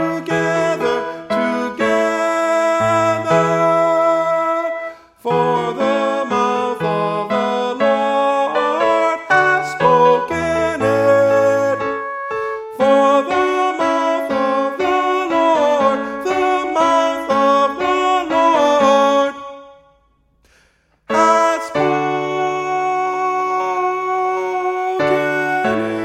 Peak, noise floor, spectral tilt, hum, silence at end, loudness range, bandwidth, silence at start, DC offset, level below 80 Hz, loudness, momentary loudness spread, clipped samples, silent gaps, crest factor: 0 dBFS; -58 dBFS; -5 dB/octave; none; 0 s; 4 LU; 15 kHz; 0 s; under 0.1%; -54 dBFS; -16 LUFS; 7 LU; under 0.1%; none; 16 dB